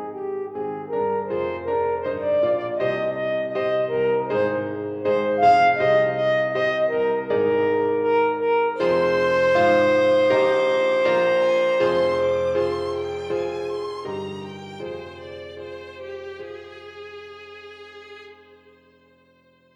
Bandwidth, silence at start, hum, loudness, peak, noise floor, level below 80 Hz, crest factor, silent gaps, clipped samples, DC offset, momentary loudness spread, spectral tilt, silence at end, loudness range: 8.4 kHz; 0 s; none; -21 LUFS; -6 dBFS; -58 dBFS; -60 dBFS; 16 dB; none; under 0.1%; under 0.1%; 19 LU; -6 dB/octave; 1.4 s; 18 LU